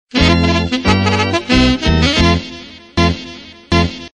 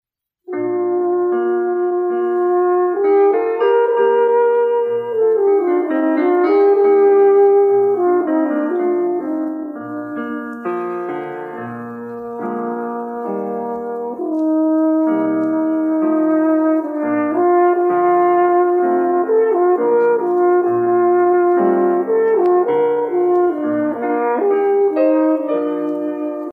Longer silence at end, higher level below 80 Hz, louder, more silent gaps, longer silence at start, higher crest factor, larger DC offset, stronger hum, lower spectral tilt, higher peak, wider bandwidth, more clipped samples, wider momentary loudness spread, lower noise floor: about the same, 0.05 s vs 0 s; first, -24 dBFS vs -70 dBFS; about the same, -14 LUFS vs -16 LUFS; neither; second, 0.15 s vs 0.5 s; about the same, 14 dB vs 12 dB; neither; neither; second, -5.5 dB/octave vs -9 dB/octave; first, 0 dBFS vs -4 dBFS; first, 9.8 kHz vs 4.1 kHz; neither; first, 15 LU vs 11 LU; second, -33 dBFS vs -37 dBFS